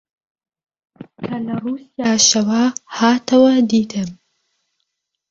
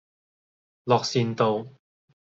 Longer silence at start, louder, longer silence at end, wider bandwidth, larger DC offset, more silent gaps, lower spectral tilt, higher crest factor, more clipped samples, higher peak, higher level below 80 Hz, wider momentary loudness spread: first, 1 s vs 0.85 s; first, -16 LUFS vs -24 LUFS; first, 1.15 s vs 0.6 s; about the same, 7.8 kHz vs 7.8 kHz; neither; neither; second, -3 dB/octave vs -5.5 dB/octave; about the same, 18 dB vs 22 dB; neither; first, -2 dBFS vs -6 dBFS; first, -60 dBFS vs -68 dBFS; about the same, 14 LU vs 15 LU